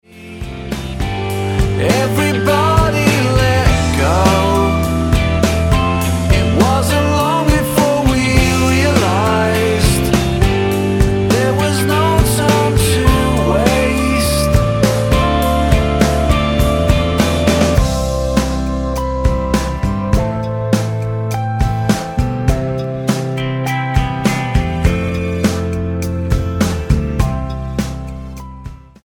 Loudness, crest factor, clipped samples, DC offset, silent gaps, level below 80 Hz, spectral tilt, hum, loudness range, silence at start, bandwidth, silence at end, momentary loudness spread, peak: -15 LUFS; 14 dB; under 0.1%; under 0.1%; none; -22 dBFS; -5.5 dB/octave; none; 4 LU; 0.15 s; 17.5 kHz; 0.3 s; 7 LU; 0 dBFS